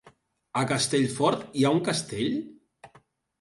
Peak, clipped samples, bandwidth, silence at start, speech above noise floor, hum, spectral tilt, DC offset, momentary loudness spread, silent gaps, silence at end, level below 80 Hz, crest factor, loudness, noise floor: -10 dBFS; under 0.1%; 11.5 kHz; 0.05 s; 35 dB; none; -4.5 dB/octave; under 0.1%; 9 LU; none; 0.55 s; -64 dBFS; 18 dB; -26 LUFS; -61 dBFS